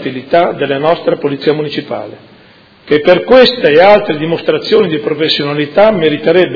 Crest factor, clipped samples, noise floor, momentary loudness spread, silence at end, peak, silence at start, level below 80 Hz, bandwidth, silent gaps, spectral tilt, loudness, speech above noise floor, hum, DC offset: 10 dB; 1%; -42 dBFS; 10 LU; 0 s; 0 dBFS; 0 s; -46 dBFS; 5.4 kHz; none; -7 dB/octave; -10 LUFS; 32 dB; none; under 0.1%